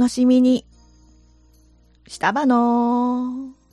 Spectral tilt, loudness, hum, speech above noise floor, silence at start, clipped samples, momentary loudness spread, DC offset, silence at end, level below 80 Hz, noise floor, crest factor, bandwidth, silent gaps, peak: -5 dB/octave; -19 LUFS; none; 36 dB; 0 s; under 0.1%; 13 LU; under 0.1%; 0.2 s; -54 dBFS; -54 dBFS; 16 dB; 11 kHz; none; -6 dBFS